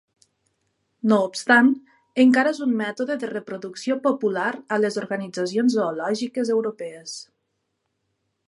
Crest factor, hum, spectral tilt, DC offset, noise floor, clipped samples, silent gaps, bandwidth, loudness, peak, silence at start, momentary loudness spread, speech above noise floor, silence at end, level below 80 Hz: 20 dB; none; -5 dB/octave; under 0.1%; -75 dBFS; under 0.1%; none; 11.5 kHz; -22 LUFS; -4 dBFS; 1.05 s; 14 LU; 54 dB; 1.25 s; -78 dBFS